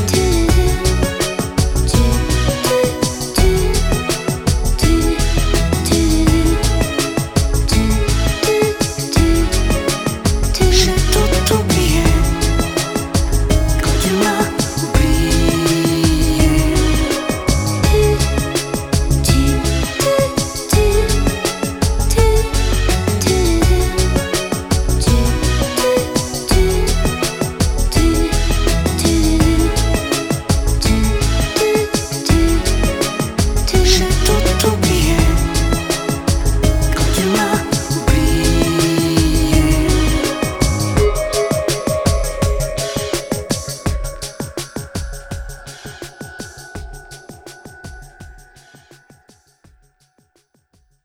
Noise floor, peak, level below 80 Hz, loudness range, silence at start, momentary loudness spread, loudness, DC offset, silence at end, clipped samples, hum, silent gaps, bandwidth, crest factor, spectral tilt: -60 dBFS; 0 dBFS; -18 dBFS; 5 LU; 0 s; 7 LU; -16 LUFS; under 0.1%; 2.7 s; under 0.1%; none; none; 18.5 kHz; 14 dB; -4.5 dB/octave